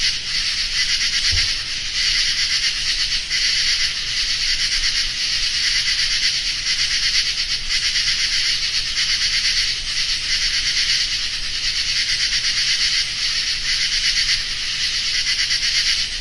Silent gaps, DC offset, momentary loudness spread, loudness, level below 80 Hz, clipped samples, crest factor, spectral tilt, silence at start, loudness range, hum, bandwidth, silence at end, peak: none; under 0.1%; 3 LU; -17 LUFS; -36 dBFS; under 0.1%; 16 dB; 1.5 dB/octave; 0 s; 1 LU; none; 11.5 kHz; 0 s; -4 dBFS